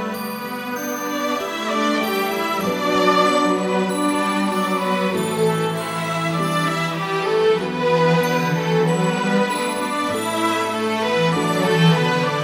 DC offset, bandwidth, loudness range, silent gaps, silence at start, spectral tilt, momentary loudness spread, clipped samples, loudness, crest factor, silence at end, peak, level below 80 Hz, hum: under 0.1%; 17 kHz; 2 LU; none; 0 s; -5 dB/octave; 7 LU; under 0.1%; -20 LUFS; 16 dB; 0 s; -4 dBFS; -62 dBFS; none